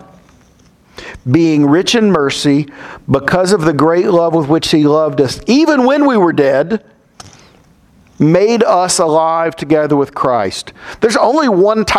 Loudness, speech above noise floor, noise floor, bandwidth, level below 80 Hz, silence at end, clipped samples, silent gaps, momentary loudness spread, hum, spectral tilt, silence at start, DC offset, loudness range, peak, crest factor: -12 LUFS; 36 dB; -47 dBFS; 14 kHz; -44 dBFS; 0 s; under 0.1%; none; 7 LU; none; -5 dB/octave; 1 s; under 0.1%; 3 LU; 0 dBFS; 12 dB